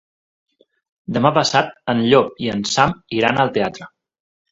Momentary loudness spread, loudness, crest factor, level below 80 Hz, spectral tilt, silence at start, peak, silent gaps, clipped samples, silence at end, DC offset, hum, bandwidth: 10 LU; -18 LUFS; 20 dB; -52 dBFS; -4.5 dB/octave; 1.1 s; 0 dBFS; none; under 0.1%; 0.65 s; under 0.1%; none; 8 kHz